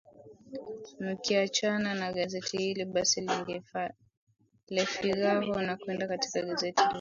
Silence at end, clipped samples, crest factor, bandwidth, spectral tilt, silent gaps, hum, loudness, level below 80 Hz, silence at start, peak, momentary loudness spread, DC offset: 0 s; under 0.1%; 22 dB; 7.6 kHz; -3 dB/octave; 4.17-4.27 s, 4.63-4.67 s; none; -31 LUFS; -68 dBFS; 0.2 s; -10 dBFS; 11 LU; under 0.1%